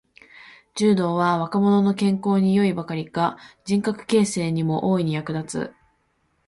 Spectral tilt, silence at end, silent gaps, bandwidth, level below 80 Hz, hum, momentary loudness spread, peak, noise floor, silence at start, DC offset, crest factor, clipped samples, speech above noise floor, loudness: -6.5 dB/octave; 0.8 s; none; 11.5 kHz; -60 dBFS; none; 9 LU; -8 dBFS; -68 dBFS; 0.75 s; under 0.1%; 14 dB; under 0.1%; 47 dB; -22 LUFS